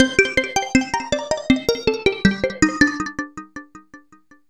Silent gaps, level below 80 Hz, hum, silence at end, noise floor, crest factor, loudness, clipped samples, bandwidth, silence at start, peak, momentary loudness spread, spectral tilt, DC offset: none; -42 dBFS; none; 0.5 s; -53 dBFS; 20 dB; -19 LUFS; under 0.1%; 14 kHz; 0 s; -2 dBFS; 15 LU; -4 dB/octave; 0.1%